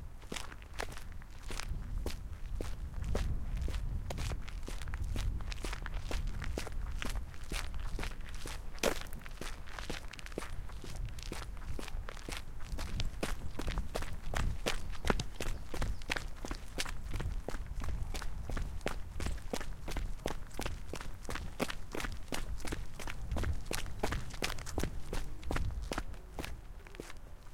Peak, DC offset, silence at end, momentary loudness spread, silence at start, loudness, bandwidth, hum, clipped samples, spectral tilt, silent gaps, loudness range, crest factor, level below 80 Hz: -12 dBFS; under 0.1%; 0 s; 7 LU; 0 s; -42 LUFS; 16.5 kHz; none; under 0.1%; -4.5 dB/octave; none; 3 LU; 24 dB; -40 dBFS